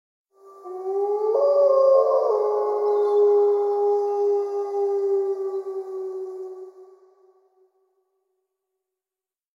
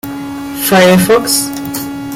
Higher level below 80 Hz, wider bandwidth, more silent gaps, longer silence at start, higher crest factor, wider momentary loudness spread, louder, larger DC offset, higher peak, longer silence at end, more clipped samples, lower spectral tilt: second, under -90 dBFS vs -44 dBFS; second, 6.4 kHz vs 17 kHz; neither; first, 0.45 s vs 0.05 s; about the same, 16 dB vs 12 dB; about the same, 16 LU vs 15 LU; second, -21 LUFS vs -10 LUFS; neither; second, -8 dBFS vs 0 dBFS; first, 2.7 s vs 0 s; neither; about the same, -4.5 dB/octave vs -4 dB/octave